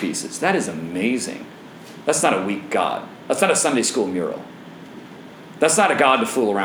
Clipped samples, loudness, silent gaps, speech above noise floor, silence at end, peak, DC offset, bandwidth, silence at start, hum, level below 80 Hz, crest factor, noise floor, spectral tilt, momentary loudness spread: under 0.1%; -20 LUFS; none; 20 dB; 0 s; -2 dBFS; under 0.1%; over 20 kHz; 0 s; none; -70 dBFS; 20 dB; -40 dBFS; -3 dB/octave; 23 LU